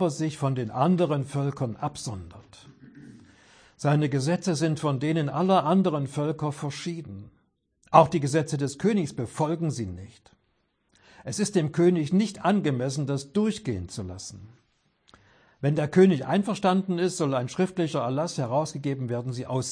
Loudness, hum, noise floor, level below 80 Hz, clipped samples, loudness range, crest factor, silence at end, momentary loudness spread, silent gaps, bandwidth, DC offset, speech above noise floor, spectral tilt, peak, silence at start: -26 LUFS; none; -72 dBFS; -62 dBFS; under 0.1%; 5 LU; 24 dB; 0 s; 14 LU; none; 10.5 kHz; under 0.1%; 46 dB; -6.5 dB/octave; -2 dBFS; 0 s